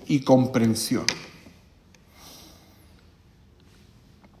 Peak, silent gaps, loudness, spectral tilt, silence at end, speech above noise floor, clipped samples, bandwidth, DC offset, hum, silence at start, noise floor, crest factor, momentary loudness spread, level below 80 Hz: -2 dBFS; none; -22 LUFS; -5 dB/octave; 2.1 s; 33 dB; under 0.1%; 16 kHz; under 0.1%; none; 0 s; -55 dBFS; 26 dB; 27 LU; -58 dBFS